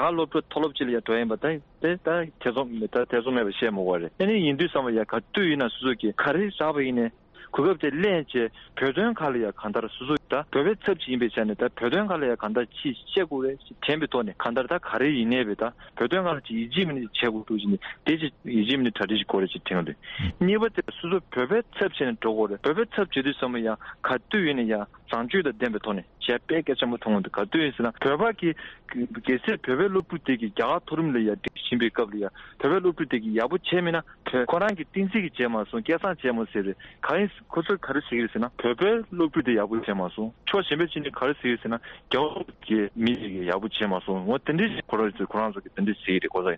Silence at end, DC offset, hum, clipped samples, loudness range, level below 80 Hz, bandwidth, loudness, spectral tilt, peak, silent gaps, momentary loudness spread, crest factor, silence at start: 0 s; under 0.1%; none; under 0.1%; 2 LU; -56 dBFS; 6.6 kHz; -26 LUFS; -3.5 dB/octave; -10 dBFS; none; 6 LU; 16 dB; 0 s